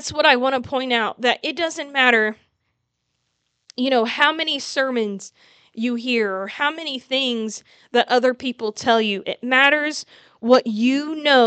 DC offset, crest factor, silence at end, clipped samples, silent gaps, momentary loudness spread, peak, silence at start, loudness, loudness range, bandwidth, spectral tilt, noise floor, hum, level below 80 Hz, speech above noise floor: under 0.1%; 20 dB; 0 s; under 0.1%; none; 11 LU; 0 dBFS; 0 s; -19 LUFS; 4 LU; 9 kHz; -3 dB/octave; -74 dBFS; none; -66 dBFS; 54 dB